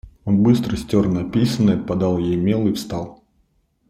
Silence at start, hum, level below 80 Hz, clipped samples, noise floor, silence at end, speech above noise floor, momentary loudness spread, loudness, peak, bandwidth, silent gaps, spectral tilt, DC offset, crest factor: 0.05 s; none; -44 dBFS; under 0.1%; -63 dBFS; 0.75 s; 45 dB; 9 LU; -19 LUFS; -4 dBFS; 15.5 kHz; none; -7.5 dB/octave; under 0.1%; 16 dB